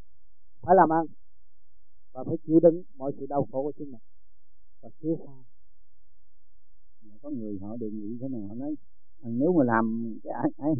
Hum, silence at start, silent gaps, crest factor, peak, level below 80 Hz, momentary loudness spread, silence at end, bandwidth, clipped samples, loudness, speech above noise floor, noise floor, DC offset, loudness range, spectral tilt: none; 0.65 s; none; 22 dB; -8 dBFS; -66 dBFS; 19 LU; 0 s; 2.3 kHz; under 0.1%; -27 LUFS; 40 dB; -66 dBFS; 2%; 15 LU; -4.5 dB/octave